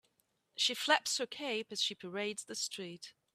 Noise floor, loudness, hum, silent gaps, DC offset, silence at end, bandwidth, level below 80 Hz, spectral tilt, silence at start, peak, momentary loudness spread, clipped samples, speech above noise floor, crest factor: -78 dBFS; -35 LUFS; none; none; under 0.1%; 0.25 s; 15.5 kHz; -88 dBFS; -1 dB/octave; 0.55 s; -12 dBFS; 15 LU; under 0.1%; 41 dB; 26 dB